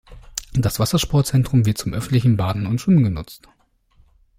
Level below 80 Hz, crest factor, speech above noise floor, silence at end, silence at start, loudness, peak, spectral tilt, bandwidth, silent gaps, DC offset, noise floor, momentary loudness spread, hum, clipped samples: -40 dBFS; 16 dB; 39 dB; 1 s; 0.1 s; -19 LUFS; -4 dBFS; -6 dB/octave; 16 kHz; none; under 0.1%; -57 dBFS; 13 LU; none; under 0.1%